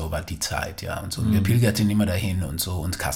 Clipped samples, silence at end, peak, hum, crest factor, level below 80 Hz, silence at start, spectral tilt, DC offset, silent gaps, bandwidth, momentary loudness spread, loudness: under 0.1%; 0 s; -8 dBFS; none; 16 dB; -38 dBFS; 0 s; -5 dB/octave; under 0.1%; none; 17 kHz; 10 LU; -24 LUFS